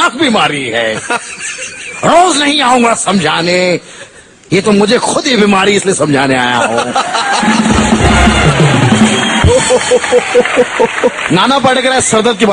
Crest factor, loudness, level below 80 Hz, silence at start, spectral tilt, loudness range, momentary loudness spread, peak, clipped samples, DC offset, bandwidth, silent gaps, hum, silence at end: 10 dB; -9 LUFS; -26 dBFS; 0 s; -4 dB/octave; 2 LU; 6 LU; 0 dBFS; 0.2%; under 0.1%; 11.5 kHz; none; none; 0 s